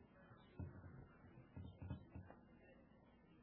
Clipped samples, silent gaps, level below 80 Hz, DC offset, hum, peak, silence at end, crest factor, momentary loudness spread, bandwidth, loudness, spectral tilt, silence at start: under 0.1%; none; -70 dBFS; under 0.1%; none; -38 dBFS; 0 s; 20 dB; 12 LU; 3.9 kHz; -60 LUFS; -7.5 dB/octave; 0 s